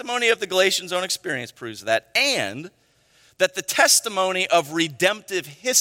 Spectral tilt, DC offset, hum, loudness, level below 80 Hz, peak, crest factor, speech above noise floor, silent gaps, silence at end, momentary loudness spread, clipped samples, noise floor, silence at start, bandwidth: -1 dB/octave; under 0.1%; none; -21 LUFS; -70 dBFS; -2 dBFS; 20 dB; 36 dB; none; 0 s; 12 LU; under 0.1%; -58 dBFS; 0 s; 16.5 kHz